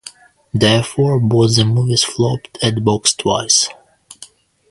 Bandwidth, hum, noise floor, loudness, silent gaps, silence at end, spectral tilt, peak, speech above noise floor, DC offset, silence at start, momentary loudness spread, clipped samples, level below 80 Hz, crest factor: 11.5 kHz; none; -43 dBFS; -15 LUFS; none; 0.45 s; -4 dB/octave; 0 dBFS; 28 dB; under 0.1%; 0.05 s; 6 LU; under 0.1%; -46 dBFS; 16 dB